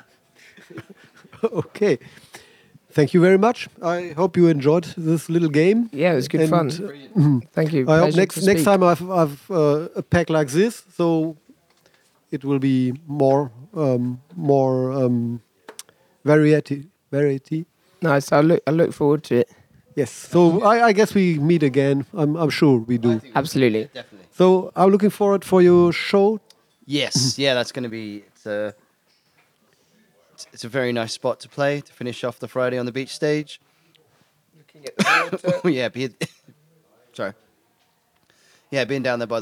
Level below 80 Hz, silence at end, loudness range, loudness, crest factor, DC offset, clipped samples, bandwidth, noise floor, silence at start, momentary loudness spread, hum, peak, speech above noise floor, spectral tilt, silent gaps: -62 dBFS; 0 s; 9 LU; -20 LUFS; 18 dB; under 0.1%; under 0.1%; 16 kHz; -64 dBFS; 0.75 s; 14 LU; none; -2 dBFS; 45 dB; -6 dB/octave; none